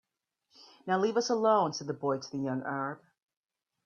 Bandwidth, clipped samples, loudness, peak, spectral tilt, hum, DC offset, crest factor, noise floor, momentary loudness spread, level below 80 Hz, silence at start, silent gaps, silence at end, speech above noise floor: 7.2 kHz; under 0.1%; -31 LUFS; -12 dBFS; -5 dB/octave; none; under 0.1%; 20 dB; -80 dBFS; 11 LU; -78 dBFS; 0.6 s; none; 0.9 s; 50 dB